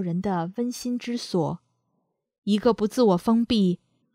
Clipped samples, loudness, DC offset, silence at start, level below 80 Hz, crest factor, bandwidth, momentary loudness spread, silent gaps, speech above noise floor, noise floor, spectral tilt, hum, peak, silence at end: under 0.1%; -24 LUFS; under 0.1%; 0 s; -58 dBFS; 18 dB; 15 kHz; 9 LU; 2.38-2.42 s; 52 dB; -75 dBFS; -6.5 dB/octave; none; -8 dBFS; 0.4 s